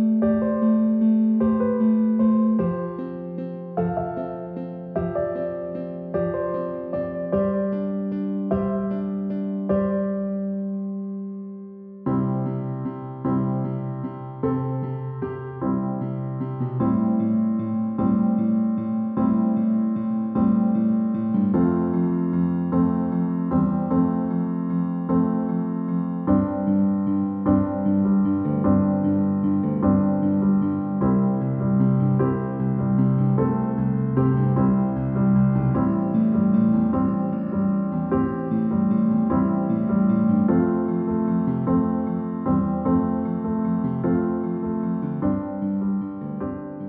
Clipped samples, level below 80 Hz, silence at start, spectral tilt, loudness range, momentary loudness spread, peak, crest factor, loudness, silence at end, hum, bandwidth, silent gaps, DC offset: under 0.1%; -48 dBFS; 0 s; -11.5 dB/octave; 6 LU; 9 LU; -6 dBFS; 16 dB; -23 LUFS; 0 s; none; 3.1 kHz; none; under 0.1%